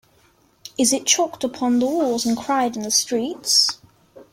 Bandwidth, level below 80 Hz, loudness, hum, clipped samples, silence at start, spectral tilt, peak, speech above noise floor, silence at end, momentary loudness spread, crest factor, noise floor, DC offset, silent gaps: 16.5 kHz; -62 dBFS; -19 LUFS; none; under 0.1%; 0.65 s; -1.5 dB/octave; -2 dBFS; 38 dB; 0.1 s; 8 LU; 20 dB; -58 dBFS; under 0.1%; none